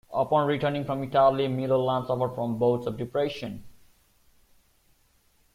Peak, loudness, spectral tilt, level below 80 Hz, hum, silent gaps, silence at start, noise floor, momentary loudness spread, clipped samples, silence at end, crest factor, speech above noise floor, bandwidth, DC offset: -10 dBFS; -26 LUFS; -7.5 dB/octave; -60 dBFS; none; none; 0.1 s; -65 dBFS; 9 LU; under 0.1%; 1.85 s; 18 dB; 39 dB; 15.5 kHz; under 0.1%